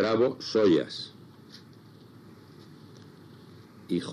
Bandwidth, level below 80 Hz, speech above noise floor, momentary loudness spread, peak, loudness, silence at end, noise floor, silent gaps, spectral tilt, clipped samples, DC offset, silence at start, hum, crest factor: 12.5 kHz; -74 dBFS; 26 dB; 27 LU; -12 dBFS; -27 LUFS; 0 s; -51 dBFS; none; -6 dB/octave; under 0.1%; under 0.1%; 0 s; none; 18 dB